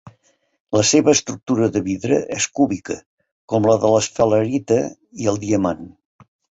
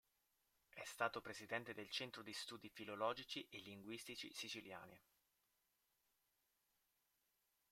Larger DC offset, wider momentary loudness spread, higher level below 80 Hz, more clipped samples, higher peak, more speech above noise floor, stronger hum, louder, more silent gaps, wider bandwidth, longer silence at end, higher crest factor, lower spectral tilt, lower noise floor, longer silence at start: neither; about the same, 9 LU vs 11 LU; first, -52 dBFS vs -86 dBFS; neither; first, -2 dBFS vs -26 dBFS; first, 42 dB vs 36 dB; neither; first, -19 LUFS vs -49 LUFS; first, 0.60-0.65 s, 3.06-3.18 s, 3.31-3.48 s vs none; second, 8.2 kHz vs 16 kHz; second, 0.7 s vs 2.7 s; second, 18 dB vs 28 dB; first, -4.5 dB/octave vs -3 dB/octave; second, -61 dBFS vs -86 dBFS; second, 0.05 s vs 0.75 s